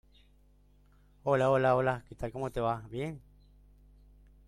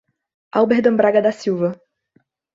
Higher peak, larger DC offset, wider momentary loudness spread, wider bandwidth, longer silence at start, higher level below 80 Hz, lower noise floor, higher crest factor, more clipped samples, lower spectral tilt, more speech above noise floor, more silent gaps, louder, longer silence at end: second, -14 dBFS vs -2 dBFS; neither; first, 14 LU vs 9 LU; first, 13.5 kHz vs 7.8 kHz; first, 1.25 s vs 0.55 s; first, -56 dBFS vs -64 dBFS; about the same, -63 dBFS vs -62 dBFS; about the same, 18 dB vs 18 dB; neither; about the same, -7.5 dB/octave vs -7 dB/octave; second, 32 dB vs 46 dB; neither; second, -31 LUFS vs -17 LUFS; first, 1.3 s vs 0.8 s